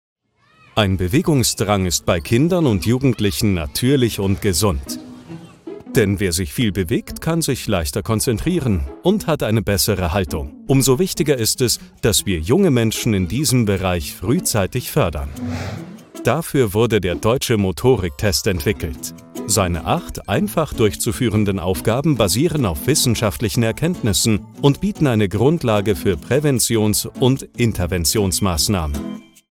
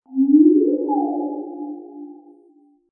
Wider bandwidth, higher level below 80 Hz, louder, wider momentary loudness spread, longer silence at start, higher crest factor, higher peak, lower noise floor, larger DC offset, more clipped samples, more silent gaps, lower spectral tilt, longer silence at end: first, 17.5 kHz vs 1 kHz; first, -34 dBFS vs -88 dBFS; about the same, -18 LUFS vs -17 LUFS; second, 7 LU vs 23 LU; first, 0.75 s vs 0.1 s; about the same, 16 dB vs 16 dB; about the same, -2 dBFS vs -4 dBFS; about the same, -54 dBFS vs -54 dBFS; neither; neither; neither; second, -5 dB/octave vs -14 dB/octave; second, 0.3 s vs 0.75 s